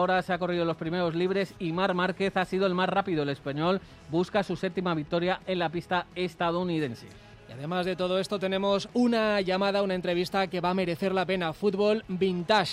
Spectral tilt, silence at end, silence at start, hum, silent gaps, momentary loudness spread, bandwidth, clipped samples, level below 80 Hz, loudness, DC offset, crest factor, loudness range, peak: -6 dB/octave; 0 s; 0 s; none; none; 5 LU; 14.5 kHz; under 0.1%; -58 dBFS; -28 LUFS; under 0.1%; 18 dB; 3 LU; -10 dBFS